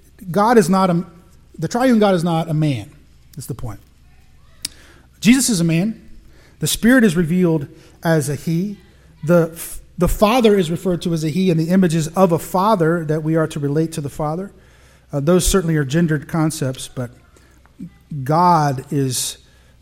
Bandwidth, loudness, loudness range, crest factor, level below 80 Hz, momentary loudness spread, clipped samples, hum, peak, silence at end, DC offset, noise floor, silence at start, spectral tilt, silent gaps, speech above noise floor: 16.5 kHz; -17 LUFS; 4 LU; 18 dB; -38 dBFS; 17 LU; under 0.1%; none; 0 dBFS; 0.5 s; under 0.1%; -49 dBFS; 0.2 s; -5.5 dB/octave; none; 32 dB